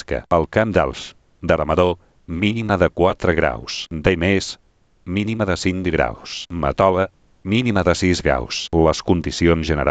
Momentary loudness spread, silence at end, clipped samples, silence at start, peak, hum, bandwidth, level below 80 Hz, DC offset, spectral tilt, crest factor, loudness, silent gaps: 11 LU; 0 s; under 0.1%; 0.1 s; -2 dBFS; none; 9 kHz; -36 dBFS; under 0.1%; -5.5 dB/octave; 18 dB; -19 LUFS; none